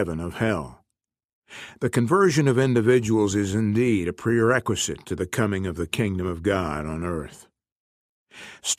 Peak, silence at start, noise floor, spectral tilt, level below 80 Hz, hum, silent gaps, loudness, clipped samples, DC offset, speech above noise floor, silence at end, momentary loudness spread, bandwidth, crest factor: -6 dBFS; 0 s; -83 dBFS; -5.5 dB/octave; -48 dBFS; none; 1.25-1.42 s, 7.72-8.26 s; -23 LUFS; under 0.1%; under 0.1%; 60 dB; 0.05 s; 14 LU; 15.5 kHz; 18 dB